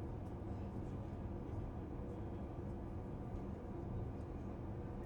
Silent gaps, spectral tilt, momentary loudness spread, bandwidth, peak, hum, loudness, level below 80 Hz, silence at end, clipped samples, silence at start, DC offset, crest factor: none; -9.5 dB/octave; 1 LU; 17.5 kHz; -34 dBFS; none; -47 LUFS; -52 dBFS; 0 s; under 0.1%; 0 s; under 0.1%; 12 dB